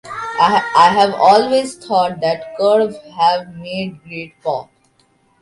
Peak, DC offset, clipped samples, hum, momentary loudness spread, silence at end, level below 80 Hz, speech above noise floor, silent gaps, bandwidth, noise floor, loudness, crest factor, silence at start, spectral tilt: 0 dBFS; under 0.1%; under 0.1%; none; 14 LU; 0.8 s; -58 dBFS; 42 dB; none; 11.5 kHz; -57 dBFS; -15 LUFS; 16 dB; 0.05 s; -4.5 dB/octave